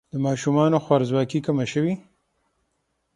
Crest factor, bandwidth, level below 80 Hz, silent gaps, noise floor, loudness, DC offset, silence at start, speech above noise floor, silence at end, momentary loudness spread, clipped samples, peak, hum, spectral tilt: 20 dB; 11 kHz; -62 dBFS; none; -73 dBFS; -22 LUFS; under 0.1%; 0.15 s; 52 dB; 1.15 s; 6 LU; under 0.1%; -4 dBFS; none; -7 dB/octave